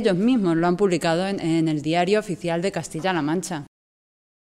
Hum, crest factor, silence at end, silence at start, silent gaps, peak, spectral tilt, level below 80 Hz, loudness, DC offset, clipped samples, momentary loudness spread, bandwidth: none; 14 dB; 0.85 s; 0 s; none; -8 dBFS; -6 dB/octave; -56 dBFS; -22 LUFS; under 0.1%; under 0.1%; 7 LU; 13.5 kHz